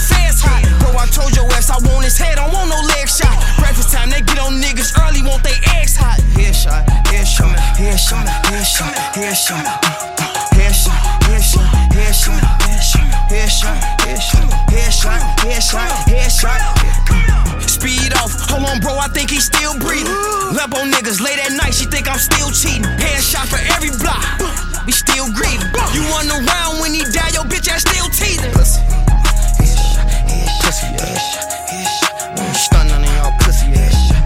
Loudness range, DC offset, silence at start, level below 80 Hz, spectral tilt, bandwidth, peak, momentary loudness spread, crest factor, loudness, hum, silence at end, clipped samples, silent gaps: 1 LU; under 0.1%; 0 s; -12 dBFS; -3 dB/octave; 16.5 kHz; 0 dBFS; 4 LU; 12 dB; -14 LUFS; none; 0 s; under 0.1%; none